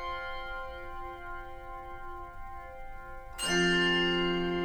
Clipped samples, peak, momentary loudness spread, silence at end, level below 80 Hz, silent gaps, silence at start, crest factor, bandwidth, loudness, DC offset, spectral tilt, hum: under 0.1%; -16 dBFS; 20 LU; 0 s; -46 dBFS; none; 0 s; 18 dB; 19 kHz; -30 LUFS; under 0.1%; -3.5 dB/octave; none